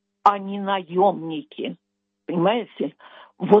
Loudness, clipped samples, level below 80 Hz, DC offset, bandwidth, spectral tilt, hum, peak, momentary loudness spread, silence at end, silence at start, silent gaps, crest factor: -23 LUFS; under 0.1%; -76 dBFS; under 0.1%; 7 kHz; -8 dB/octave; none; -2 dBFS; 13 LU; 0 s; 0.25 s; none; 20 dB